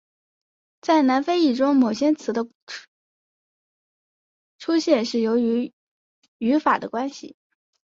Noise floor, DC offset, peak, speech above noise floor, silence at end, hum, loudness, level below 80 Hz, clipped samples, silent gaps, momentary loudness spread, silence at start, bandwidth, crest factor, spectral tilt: under -90 dBFS; under 0.1%; -6 dBFS; over 69 dB; 0.65 s; none; -21 LUFS; -70 dBFS; under 0.1%; 2.55-2.67 s, 2.88-4.59 s, 5.73-6.22 s, 6.28-6.40 s; 15 LU; 0.85 s; 7.6 kHz; 18 dB; -5 dB/octave